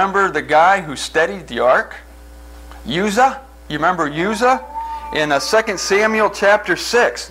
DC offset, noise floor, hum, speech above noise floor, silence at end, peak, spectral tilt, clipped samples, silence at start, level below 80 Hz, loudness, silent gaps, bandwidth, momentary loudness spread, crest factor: under 0.1%; -38 dBFS; none; 22 dB; 0 s; -2 dBFS; -3.5 dB/octave; under 0.1%; 0 s; -42 dBFS; -16 LUFS; none; 16 kHz; 12 LU; 16 dB